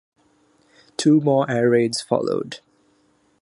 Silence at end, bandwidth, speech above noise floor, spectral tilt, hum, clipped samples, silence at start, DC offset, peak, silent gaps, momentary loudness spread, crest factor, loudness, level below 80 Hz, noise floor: 0.85 s; 11.5 kHz; 43 dB; -5.5 dB/octave; none; under 0.1%; 1 s; under 0.1%; -4 dBFS; none; 17 LU; 18 dB; -20 LUFS; -68 dBFS; -62 dBFS